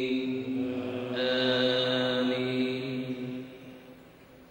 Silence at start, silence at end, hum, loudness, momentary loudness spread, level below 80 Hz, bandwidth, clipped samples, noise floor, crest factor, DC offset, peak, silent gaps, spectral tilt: 0 s; 0.05 s; none; -29 LUFS; 17 LU; -68 dBFS; 16 kHz; under 0.1%; -53 dBFS; 16 dB; under 0.1%; -14 dBFS; none; -6 dB/octave